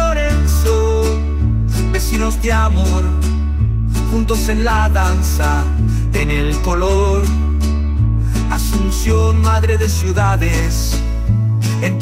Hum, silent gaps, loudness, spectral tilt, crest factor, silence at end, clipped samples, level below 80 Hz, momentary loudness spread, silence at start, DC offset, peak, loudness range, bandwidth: none; none; -16 LUFS; -6 dB/octave; 10 dB; 0 s; under 0.1%; -18 dBFS; 3 LU; 0 s; 0.3%; -4 dBFS; 1 LU; 16 kHz